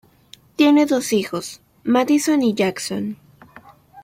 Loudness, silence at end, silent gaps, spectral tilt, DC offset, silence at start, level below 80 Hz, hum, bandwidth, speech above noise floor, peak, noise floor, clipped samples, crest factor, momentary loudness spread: -19 LUFS; 0.05 s; none; -4.5 dB/octave; under 0.1%; 0.6 s; -62 dBFS; none; 16 kHz; 32 dB; -4 dBFS; -49 dBFS; under 0.1%; 16 dB; 16 LU